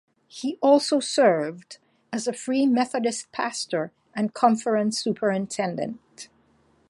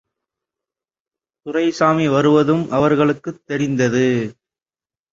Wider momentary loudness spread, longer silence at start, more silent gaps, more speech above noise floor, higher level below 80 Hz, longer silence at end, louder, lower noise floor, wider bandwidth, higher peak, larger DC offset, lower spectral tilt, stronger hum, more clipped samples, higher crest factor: first, 14 LU vs 11 LU; second, 0.35 s vs 1.45 s; neither; second, 39 dB vs over 74 dB; second, -72 dBFS vs -56 dBFS; second, 0.65 s vs 0.8 s; second, -24 LUFS vs -17 LUFS; second, -62 dBFS vs under -90 dBFS; first, 11.5 kHz vs 7.6 kHz; second, -4 dBFS vs 0 dBFS; neither; second, -4.5 dB/octave vs -6.5 dB/octave; neither; neither; about the same, 20 dB vs 18 dB